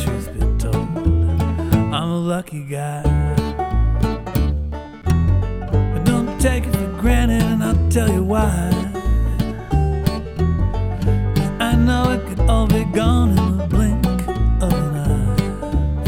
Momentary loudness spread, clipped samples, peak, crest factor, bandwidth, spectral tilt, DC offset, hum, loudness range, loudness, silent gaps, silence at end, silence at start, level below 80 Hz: 5 LU; under 0.1%; -2 dBFS; 16 dB; 17 kHz; -7 dB/octave; under 0.1%; none; 3 LU; -19 LUFS; none; 0 s; 0 s; -22 dBFS